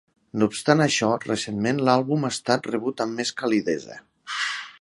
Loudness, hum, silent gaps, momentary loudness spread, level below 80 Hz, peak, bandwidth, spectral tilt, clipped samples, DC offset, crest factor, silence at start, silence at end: -24 LUFS; none; none; 10 LU; -64 dBFS; -2 dBFS; 11.5 kHz; -4.5 dB/octave; under 0.1%; under 0.1%; 22 dB; 0.35 s; 0.1 s